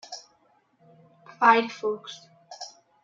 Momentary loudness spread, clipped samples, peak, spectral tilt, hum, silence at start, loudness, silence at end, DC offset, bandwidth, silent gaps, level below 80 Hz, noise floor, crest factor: 23 LU; under 0.1%; -6 dBFS; -3 dB/octave; none; 0.1 s; -23 LUFS; 0.35 s; under 0.1%; 7.6 kHz; none; -84 dBFS; -65 dBFS; 22 dB